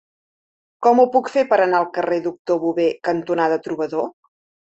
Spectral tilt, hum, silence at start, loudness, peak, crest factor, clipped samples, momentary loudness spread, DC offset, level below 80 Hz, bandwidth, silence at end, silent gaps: -6 dB/octave; none; 0.8 s; -19 LUFS; -2 dBFS; 16 dB; under 0.1%; 8 LU; under 0.1%; -66 dBFS; 8 kHz; 0.6 s; 2.39-2.45 s